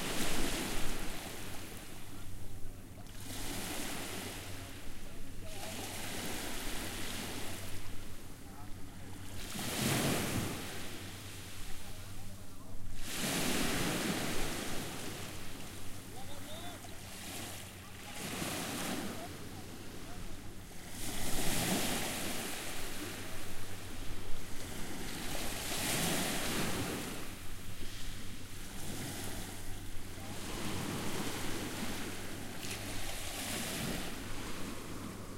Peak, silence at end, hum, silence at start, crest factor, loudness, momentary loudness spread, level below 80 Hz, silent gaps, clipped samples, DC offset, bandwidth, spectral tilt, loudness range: -18 dBFS; 0 s; none; 0 s; 18 dB; -40 LUFS; 15 LU; -46 dBFS; none; under 0.1%; under 0.1%; 16 kHz; -3 dB/octave; 7 LU